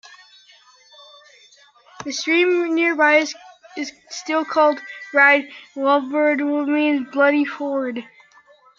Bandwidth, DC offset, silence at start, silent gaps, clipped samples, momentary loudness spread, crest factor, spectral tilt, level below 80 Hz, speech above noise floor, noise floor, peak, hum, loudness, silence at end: 7.6 kHz; under 0.1%; 2 s; none; under 0.1%; 16 LU; 20 dB; -2.5 dB/octave; -74 dBFS; 33 dB; -52 dBFS; -2 dBFS; none; -18 LUFS; 0.75 s